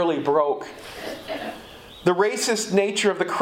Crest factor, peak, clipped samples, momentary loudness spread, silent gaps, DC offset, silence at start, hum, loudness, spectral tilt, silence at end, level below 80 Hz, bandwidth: 18 dB; -6 dBFS; under 0.1%; 14 LU; none; under 0.1%; 0 s; none; -23 LUFS; -3.5 dB/octave; 0 s; -58 dBFS; 16.5 kHz